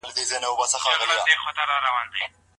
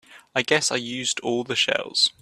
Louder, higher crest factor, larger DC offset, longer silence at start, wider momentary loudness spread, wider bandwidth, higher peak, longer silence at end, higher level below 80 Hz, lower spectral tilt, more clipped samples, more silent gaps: about the same, -22 LUFS vs -23 LUFS; about the same, 20 dB vs 20 dB; neither; about the same, 0.05 s vs 0.1 s; about the same, 6 LU vs 5 LU; second, 11.5 kHz vs 14.5 kHz; about the same, -4 dBFS vs -4 dBFS; first, 0.3 s vs 0.1 s; about the same, -66 dBFS vs -68 dBFS; second, 2 dB/octave vs -1.5 dB/octave; neither; neither